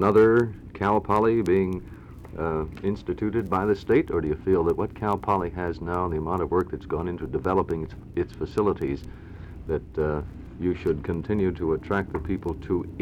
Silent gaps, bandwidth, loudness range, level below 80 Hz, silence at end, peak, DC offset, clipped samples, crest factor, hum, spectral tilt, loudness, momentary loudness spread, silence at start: none; 11.5 kHz; 4 LU; -42 dBFS; 0 s; -8 dBFS; under 0.1%; under 0.1%; 18 dB; none; -9 dB/octave; -26 LUFS; 10 LU; 0 s